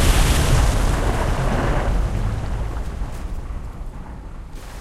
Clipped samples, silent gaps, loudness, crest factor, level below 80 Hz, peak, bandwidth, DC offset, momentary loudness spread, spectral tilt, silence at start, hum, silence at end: under 0.1%; none; -22 LUFS; 16 dB; -22 dBFS; -4 dBFS; 14 kHz; under 0.1%; 19 LU; -5 dB/octave; 0 s; none; 0 s